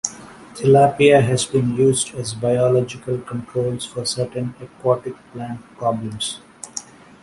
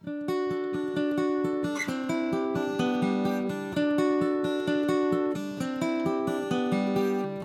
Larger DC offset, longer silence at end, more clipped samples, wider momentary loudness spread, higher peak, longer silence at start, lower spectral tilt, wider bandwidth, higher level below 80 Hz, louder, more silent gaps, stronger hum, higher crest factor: neither; first, 0.4 s vs 0 s; neither; first, 18 LU vs 5 LU; first, -2 dBFS vs -14 dBFS; about the same, 0.05 s vs 0.05 s; second, -5 dB/octave vs -6.5 dB/octave; second, 11.5 kHz vs 14.5 kHz; first, -54 dBFS vs -66 dBFS; first, -19 LUFS vs -28 LUFS; neither; neither; about the same, 18 dB vs 14 dB